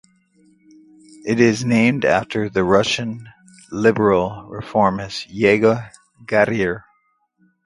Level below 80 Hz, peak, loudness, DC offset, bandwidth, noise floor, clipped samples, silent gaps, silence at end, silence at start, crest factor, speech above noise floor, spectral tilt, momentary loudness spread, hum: -50 dBFS; 0 dBFS; -18 LUFS; under 0.1%; 11.5 kHz; -64 dBFS; under 0.1%; none; 0.85 s; 1.25 s; 20 dB; 47 dB; -5.5 dB/octave; 14 LU; none